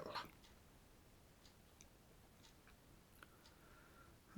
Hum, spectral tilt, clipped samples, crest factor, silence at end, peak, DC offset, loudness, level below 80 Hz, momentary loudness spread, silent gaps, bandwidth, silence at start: none; -3.5 dB/octave; under 0.1%; 24 dB; 0 s; -36 dBFS; under 0.1%; -62 LUFS; -72 dBFS; 9 LU; none; 19.5 kHz; 0 s